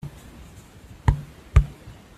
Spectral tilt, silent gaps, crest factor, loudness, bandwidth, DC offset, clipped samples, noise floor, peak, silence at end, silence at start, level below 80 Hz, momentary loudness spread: -7.5 dB/octave; none; 22 dB; -25 LUFS; 12 kHz; under 0.1%; under 0.1%; -46 dBFS; -4 dBFS; 0.25 s; 0.05 s; -28 dBFS; 24 LU